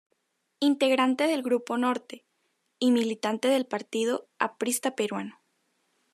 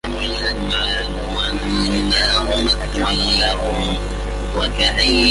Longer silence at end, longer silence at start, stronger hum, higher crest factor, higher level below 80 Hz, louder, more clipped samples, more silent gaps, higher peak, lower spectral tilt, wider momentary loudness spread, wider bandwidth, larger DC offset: first, 0.8 s vs 0 s; first, 0.6 s vs 0.05 s; second, none vs 50 Hz at -25 dBFS; about the same, 20 dB vs 16 dB; second, -88 dBFS vs -24 dBFS; second, -27 LUFS vs -18 LUFS; neither; neither; second, -8 dBFS vs -2 dBFS; about the same, -3.5 dB/octave vs -4 dB/octave; about the same, 9 LU vs 8 LU; first, 13.5 kHz vs 11.5 kHz; neither